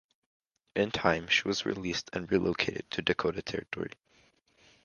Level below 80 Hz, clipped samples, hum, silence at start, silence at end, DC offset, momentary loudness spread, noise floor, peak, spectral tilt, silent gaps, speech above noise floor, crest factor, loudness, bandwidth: -58 dBFS; under 0.1%; none; 0.75 s; 0.95 s; under 0.1%; 10 LU; -66 dBFS; -8 dBFS; -4 dB/octave; none; 35 dB; 26 dB; -31 LUFS; 10 kHz